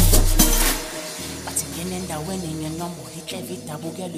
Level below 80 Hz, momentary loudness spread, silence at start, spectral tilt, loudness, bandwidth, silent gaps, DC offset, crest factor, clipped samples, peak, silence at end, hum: -24 dBFS; 15 LU; 0 s; -3.5 dB/octave; -24 LUFS; 15.5 kHz; none; under 0.1%; 22 dB; under 0.1%; 0 dBFS; 0 s; none